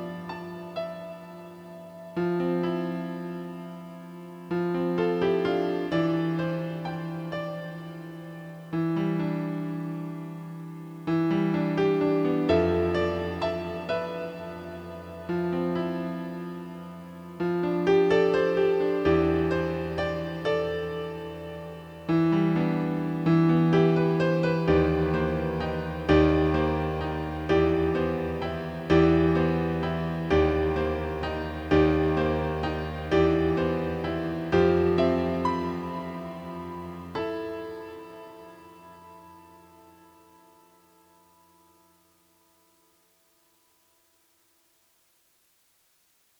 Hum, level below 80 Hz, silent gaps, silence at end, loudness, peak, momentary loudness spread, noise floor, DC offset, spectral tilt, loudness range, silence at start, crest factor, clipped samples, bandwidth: none; -44 dBFS; none; 7 s; -26 LUFS; -8 dBFS; 17 LU; -67 dBFS; under 0.1%; -8 dB/octave; 8 LU; 0 s; 18 dB; under 0.1%; 8.6 kHz